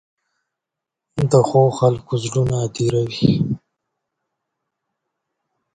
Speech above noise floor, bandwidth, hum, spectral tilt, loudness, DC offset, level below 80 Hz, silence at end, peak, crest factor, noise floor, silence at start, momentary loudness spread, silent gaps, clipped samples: 67 dB; 9.4 kHz; none; -7 dB/octave; -18 LUFS; under 0.1%; -48 dBFS; 2.15 s; 0 dBFS; 20 dB; -84 dBFS; 1.15 s; 9 LU; none; under 0.1%